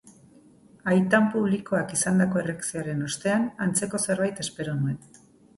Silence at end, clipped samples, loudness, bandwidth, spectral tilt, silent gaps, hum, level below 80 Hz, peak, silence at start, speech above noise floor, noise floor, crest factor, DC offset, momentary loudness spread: 0.6 s; under 0.1%; -25 LUFS; 11.5 kHz; -5 dB/octave; none; none; -62 dBFS; -6 dBFS; 0.05 s; 29 dB; -54 dBFS; 20 dB; under 0.1%; 9 LU